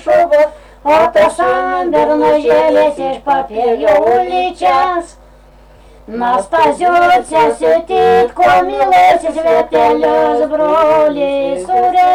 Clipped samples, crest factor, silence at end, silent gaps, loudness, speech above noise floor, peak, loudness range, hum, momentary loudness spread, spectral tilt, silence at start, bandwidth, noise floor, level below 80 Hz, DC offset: under 0.1%; 8 dB; 0 s; none; -11 LUFS; 30 dB; -4 dBFS; 4 LU; none; 6 LU; -4.5 dB/octave; 0.05 s; 14 kHz; -41 dBFS; -42 dBFS; under 0.1%